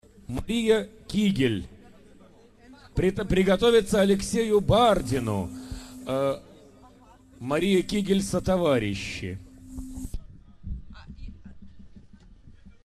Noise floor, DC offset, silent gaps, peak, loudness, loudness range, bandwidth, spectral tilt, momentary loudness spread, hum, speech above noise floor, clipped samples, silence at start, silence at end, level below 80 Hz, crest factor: -53 dBFS; under 0.1%; none; -8 dBFS; -25 LUFS; 14 LU; 13 kHz; -5.5 dB/octave; 21 LU; none; 30 dB; under 0.1%; 0.3 s; 0.15 s; -42 dBFS; 20 dB